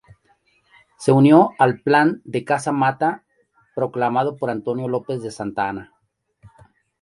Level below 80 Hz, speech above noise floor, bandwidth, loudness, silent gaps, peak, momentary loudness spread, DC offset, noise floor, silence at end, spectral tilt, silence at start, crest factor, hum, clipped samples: -62 dBFS; 50 dB; 11.5 kHz; -19 LUFS; none; 0 dBFS; 14 LU; under 0.1%; -69 dBFS; 1.2 s; -7 dB/octave; 1 s; 20 dB; none; under 0.1%